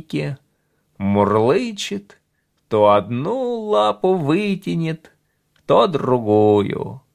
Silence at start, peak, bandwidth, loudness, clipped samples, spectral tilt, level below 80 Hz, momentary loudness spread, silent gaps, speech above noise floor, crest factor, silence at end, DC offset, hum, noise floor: 0.1 s; -2 dBFS; 13.5 kHz; -18 LUFS; under 0.1%; -7 dB/octave; -52 dBFS; 12 LU; none; 50 dB; 18 dB; 0.15 s; under 0.1%; none; -68 dBFS